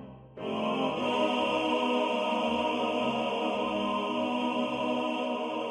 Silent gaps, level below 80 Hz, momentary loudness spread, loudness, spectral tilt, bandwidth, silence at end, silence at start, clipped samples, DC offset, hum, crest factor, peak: none; -64 dBFS; 4 LU; -29 LUFS; -5 dB/octave; 11 kHz; 0 s; 0 s; under 0.1%; under 0.1%; none; 14 dB; -16 dBFS